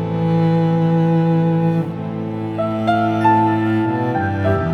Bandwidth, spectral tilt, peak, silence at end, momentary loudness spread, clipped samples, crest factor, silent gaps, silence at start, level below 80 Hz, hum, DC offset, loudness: 5.8 kHz; -9.5 dB/octave; -2 dBFS; 0 s; 8 LU; under 0.1%; 14 dB; none; 0 s; -48 dBFS; none; under 0.1%; -17 LUFS